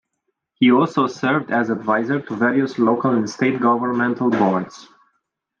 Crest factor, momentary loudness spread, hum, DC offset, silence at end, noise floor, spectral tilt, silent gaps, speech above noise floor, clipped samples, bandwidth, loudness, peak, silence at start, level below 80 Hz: 16 dB; 5 LU; none; under 0.1%; 0.75 s; -75 dBFS; -6.5 dB/octave; none; 57 dB; under 0.1%; 7.2 kHz; -19 LUFS; -4 dBFS; 0.6 s; -68 dBFS